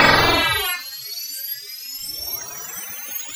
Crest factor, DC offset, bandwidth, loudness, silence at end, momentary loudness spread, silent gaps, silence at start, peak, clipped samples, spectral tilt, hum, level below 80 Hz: 20 dB; under 0.1%; over 20 kHz; -22 LUFS; 0 s; 14 LU; none; 0 s; -2 dBFS; under 0.1%; -2 dB/octave; none; -42 dBFS